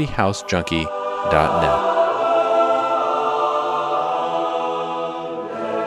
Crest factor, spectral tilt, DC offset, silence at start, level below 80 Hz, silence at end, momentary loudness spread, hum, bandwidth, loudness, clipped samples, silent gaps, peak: 20 dB; -5.5 dB/octave; under 0.1%; 0 s; -42 dBFS; 0 s; 8 LU; none; 12 kHz; -20 LUFS; under 0.1%; none; 0 dBFS